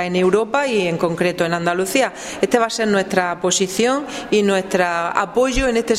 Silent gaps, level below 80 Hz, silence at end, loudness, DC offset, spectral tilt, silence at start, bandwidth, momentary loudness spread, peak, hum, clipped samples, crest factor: none; -40 dBFS; 0 s; -18 LUFS; under 0.1%; -4 dB/octave; 0 s; 16 kHz; 3 LU; 0 dBFS; none; under 0.1%; 18 dB